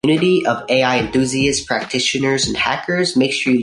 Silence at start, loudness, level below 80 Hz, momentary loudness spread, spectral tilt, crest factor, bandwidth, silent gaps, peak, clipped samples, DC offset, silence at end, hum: 0.05 s; -16 LUFS; -44 dBFS; 3 LU; -4 dB/octave; 16 dB; 11.5 kHz; none; -2 dBFS; under 0.1%; under 0.1%; 0 s; none